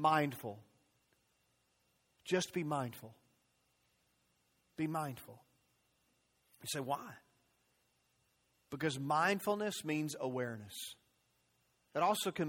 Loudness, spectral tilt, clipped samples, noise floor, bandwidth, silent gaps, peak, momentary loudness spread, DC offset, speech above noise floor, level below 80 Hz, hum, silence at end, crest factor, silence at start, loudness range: -38 LUFS; -4.5 dB/octave; under 0.1%; -78 dBFS; 16.5 kHz; none; -18 dBFS; 20 LU; under 0.1%; 41 dB; -80 dBFS; 60 Hz at -75 dBFS; 0 s; 22 dB; 0 s; 9 LU